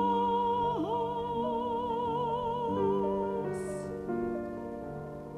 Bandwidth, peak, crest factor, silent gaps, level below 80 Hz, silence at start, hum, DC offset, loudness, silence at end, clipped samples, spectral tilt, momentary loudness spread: 13 kHz; -18 dBFS; 14 dB; none; -56 dBFS; 0 s; none; under 0.1%; -32 LUFS; 0 s; under 0.1%; -7 dB/octave; 10 LU